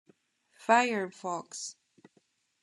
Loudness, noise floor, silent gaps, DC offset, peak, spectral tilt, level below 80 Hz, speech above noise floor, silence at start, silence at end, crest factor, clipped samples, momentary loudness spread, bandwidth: -30 LUFS; -71 dBFS; none; under 0.1%; -10 dBFS; -3 dB/octave; under -90 dBFS; 42 dB; 0.6 s; 0.9 s; 24 dB; under 0.1%; 16 LU; 12 kHz